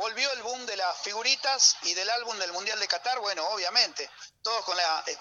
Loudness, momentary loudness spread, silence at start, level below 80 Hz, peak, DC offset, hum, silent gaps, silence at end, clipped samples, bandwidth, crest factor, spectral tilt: -26 LUFS; 11 LU; 0 s; -80 dBFS; -8 dBFS; under 0.1%; none; none; 0 s; under 0.1%; 12 kHz; 22 dB; 2.5 dB/octave